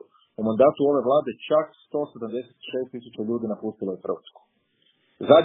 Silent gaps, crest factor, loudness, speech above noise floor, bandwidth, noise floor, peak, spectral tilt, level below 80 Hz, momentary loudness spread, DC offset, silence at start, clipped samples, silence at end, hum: none; 24 dB; -25 LUFS; 42 dB; 3.9 kHz; -67 dBFS; 0 dBFS; -5 dB/octave; -68 dBFS; 15 LU; under 0.1%; 0.4 s; under 0.1%; 0 s; none